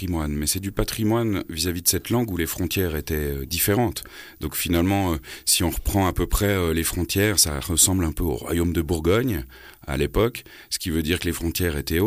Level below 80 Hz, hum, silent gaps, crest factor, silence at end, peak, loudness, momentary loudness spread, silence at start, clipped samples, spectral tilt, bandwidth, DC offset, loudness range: -34 dBFS; none; none; 18 dB; 0 s; -4 dBFS; -23 LUFS; 8 LU; 0 s; under 0.1%; -4 dB/octave; 15.5 kHz; under 0.1%; 4 LU